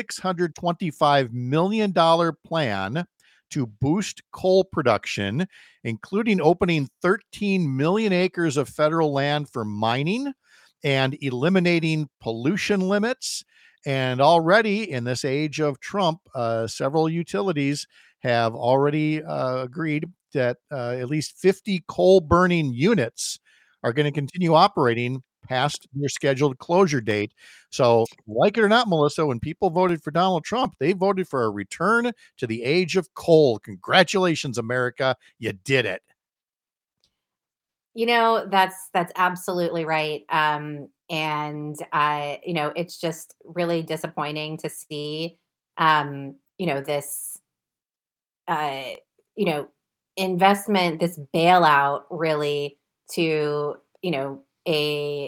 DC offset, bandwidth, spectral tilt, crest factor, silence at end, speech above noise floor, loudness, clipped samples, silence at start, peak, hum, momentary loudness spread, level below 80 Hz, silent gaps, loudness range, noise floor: under 0.1%; 18 kHz; -5.5 dB/octave; 22 dB; 0 s; over 68 dB; -23 LUFS; under 0.1%; 0 s; 0 dBFS; none; 13 LU; -58 dBFS; none; 5 LU; under -90 dBFS